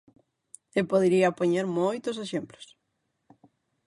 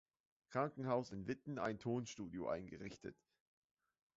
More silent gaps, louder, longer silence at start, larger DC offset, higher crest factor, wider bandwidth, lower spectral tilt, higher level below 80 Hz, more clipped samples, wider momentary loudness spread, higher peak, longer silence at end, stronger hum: neither; first, -26 LUFS vs -44 LUFS; first, 0.75 s vs 0.5 s; neither; about the same, 18 dB vs 20 dB; first, 11.5 kHz vs 7.6 kHz; about the same, -6 dB/octave vs -6 dB/octave; about the same, -70 dBFS vs -74 dBFS; neither; about the same, 11 LU vs 11 LU; first, -10 dBFS vs -26 dBFS; first, 1.25 s vs 1.05 s; neither